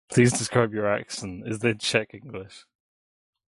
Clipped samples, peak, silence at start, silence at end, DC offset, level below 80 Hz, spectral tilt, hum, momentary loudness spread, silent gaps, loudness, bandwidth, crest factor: under 0.1%; -6 dBFS; 0.1 s; 0.9 s; under 0.1%; -58 dBFS; -4.5 dB/octave; none; 18 LU; none; -25 LUFS; 11.5 kHz; 20 dB